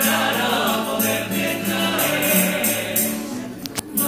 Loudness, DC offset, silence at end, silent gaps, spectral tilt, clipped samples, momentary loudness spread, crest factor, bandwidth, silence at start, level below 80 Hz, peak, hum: -20 LUFS; under 0.1%; 0 s; none; -3 dB/octave; under 0.1%; 11 LU; 18 dB; 16.5 kHz; 0 s; -56 dBFS; -2 dBFS; none